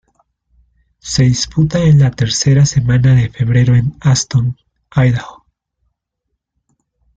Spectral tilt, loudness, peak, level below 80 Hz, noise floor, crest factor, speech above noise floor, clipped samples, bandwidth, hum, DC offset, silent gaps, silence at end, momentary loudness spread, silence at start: -5.5 dB/octave; -13 LUFS; -2 dBFS; -38 dBFS; -74 dBFS; 12 dB; 62 dB; under 0.1%; 9 kHz; none; under 0.1%; none; 1.85 s; 10 LU; 1.05 s